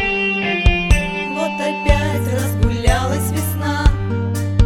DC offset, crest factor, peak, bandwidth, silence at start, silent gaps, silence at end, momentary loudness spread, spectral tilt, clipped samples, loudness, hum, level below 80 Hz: under 0.1%; 16 dB; 0 dBFS; 16.5 kHz; 0 s; none; 0 s; 5 LU; -5.5 dB/octave; under 0.1%; -18 LUFS; none; -20 dBFS